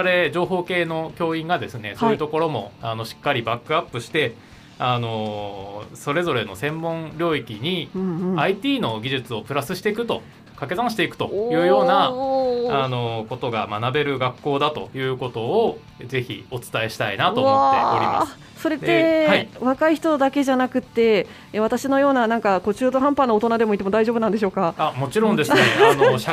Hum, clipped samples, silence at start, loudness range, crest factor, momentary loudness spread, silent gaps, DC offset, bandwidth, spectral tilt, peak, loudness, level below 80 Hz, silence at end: none; under 0.1%; 0 s; 6 LU; 20 dB; 10 LU; none; under 0.1%; 15.5 kHz; -5.5 dB/octave; -2 dBFS; -21 LUFS; -56 dBFS; 0 s